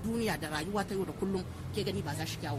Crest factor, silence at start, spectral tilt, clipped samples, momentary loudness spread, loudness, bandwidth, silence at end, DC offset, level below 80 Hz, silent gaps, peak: 18 dB; 0 s; -5.5 dB/octave; under 0.1%; 3 LU; -35 LUFS; 16 kHz; 0 s; under 0.1%; -52 dBFS; none; -18 dBFS